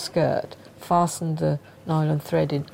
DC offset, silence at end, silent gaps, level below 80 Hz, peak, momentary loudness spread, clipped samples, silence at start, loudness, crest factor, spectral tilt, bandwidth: under 0.1%; 0 s; none; -56 dBFS; -8 dBFS; 8 LU; under 0.1%; 0 s; -24 LUFS; 16 dB; -6.5 dB/octave; 16 kHz